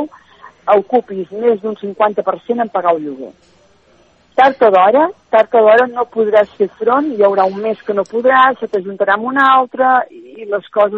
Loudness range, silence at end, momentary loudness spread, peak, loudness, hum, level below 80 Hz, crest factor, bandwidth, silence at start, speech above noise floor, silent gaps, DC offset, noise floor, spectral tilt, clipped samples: 5 LU; 0 s; 12 LU; 0 dBFS; -13 LUFS; none; -64 dBFS; 14 dB; 6.6 kHz; 0 s; 38 dB; none; under 0.1%; -51 dBFS; -6.5 dB/octave; under 0.1%